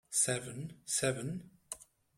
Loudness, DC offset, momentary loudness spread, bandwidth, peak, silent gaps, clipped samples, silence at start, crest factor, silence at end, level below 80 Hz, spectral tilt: -35 LUFS; under 0.1%; 16 LU; 16 kHz; -16 dBFS; none; under 0.1%; 0.1 s; 22 dB; 0.35 s; -70 dBFS; -3 dB/octave